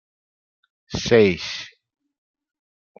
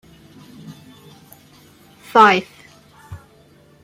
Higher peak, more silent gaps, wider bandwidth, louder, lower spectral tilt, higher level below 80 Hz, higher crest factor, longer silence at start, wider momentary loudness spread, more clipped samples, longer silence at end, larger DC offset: about the same, -2 dBFS vs -2 dBFS; neither; second, 7.2 kHz vs 16 kHz; second, -19 LUFS vs -14 LUFS; about the same, -5 dB/octave vs -4.5 dB/octave; first, -52 dBFS vs -60 dBFS; about the same, 24 dB vs 22 dB; first, 0.9 s vs 0.7 s; second, 16 LU vs 29 LU; neither; first, 1.35 s vs 0.65 s; neither